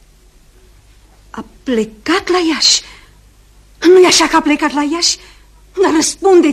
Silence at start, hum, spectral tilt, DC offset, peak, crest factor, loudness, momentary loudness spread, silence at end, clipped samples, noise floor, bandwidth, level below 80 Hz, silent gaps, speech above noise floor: 1.35 s; none; -1.5 dB/octave; under 0.1%; 0 dBFS; 14 dB; -12 LUFS; 18 LU; 0 s; under 0.1%; -46 dBFS; 14.5 kHz; -44 dBFS; none; 34 dB